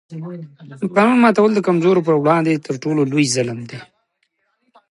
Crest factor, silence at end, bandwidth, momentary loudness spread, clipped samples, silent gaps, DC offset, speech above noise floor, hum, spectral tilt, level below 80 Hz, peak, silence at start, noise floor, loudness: 16 dB; 1.1 s; 11.5 kHz; 20 LU; under 0.1%; none; under 0.1%; 52 dB; none; -5.5 dB/octave; -66 dBFS; -2 dBFS; 0.1 s; -68 dBFS; -16 LUFS